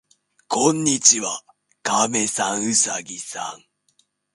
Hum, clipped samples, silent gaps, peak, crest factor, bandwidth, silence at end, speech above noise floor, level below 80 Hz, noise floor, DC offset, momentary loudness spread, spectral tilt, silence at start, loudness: none; under 0.1%; none; 0 dBFS; 22 dB; 11.5 kHz; 0.8 s; 44 dB; -68 dBFS; -65 dBFS; under 0.1%; 16 LU; -2 dB/octave; 0.5 s; -19 LUFS